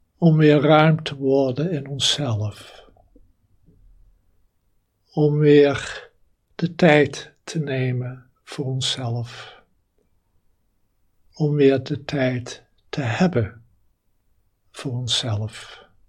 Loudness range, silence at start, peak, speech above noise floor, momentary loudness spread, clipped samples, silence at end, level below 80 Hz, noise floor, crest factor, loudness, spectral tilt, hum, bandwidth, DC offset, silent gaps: 9 LU; 0.2 s; 0 dBFS; 47 dB; 20 LU; under 0.1%; 0.35 s; -58 dBFS; -66 dBFS; 22 dB; -20 LUFS; -6 dB/octave; none; 11.5 kHz; under 0.1%; none